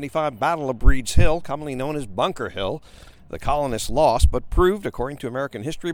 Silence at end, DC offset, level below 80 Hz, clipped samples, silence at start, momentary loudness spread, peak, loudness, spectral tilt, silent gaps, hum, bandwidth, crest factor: 0 s; under 0.1%; -26 dBFS; under 0.1%; 0 s; 9 LU; -2 dBFS; -23 LUFS; -5.5 dB/octave; none; none; 16.5 kHz; 18 dB